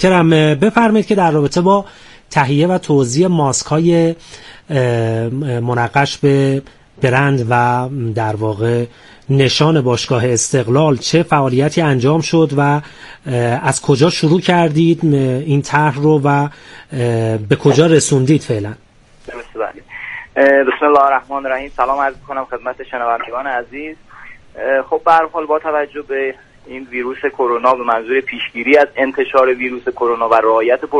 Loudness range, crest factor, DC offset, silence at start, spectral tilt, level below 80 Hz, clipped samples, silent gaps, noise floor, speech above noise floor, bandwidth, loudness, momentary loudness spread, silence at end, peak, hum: 4 LU; 14 dB; under 0.1%; 0 s; -5.5 dB/octave; -48 dBFS; under 0.1%; none; -37 dBFS; 23 dB; 11.5 kHz; -14 LUFS; 12 LU; 0 s; 0 dBFS; none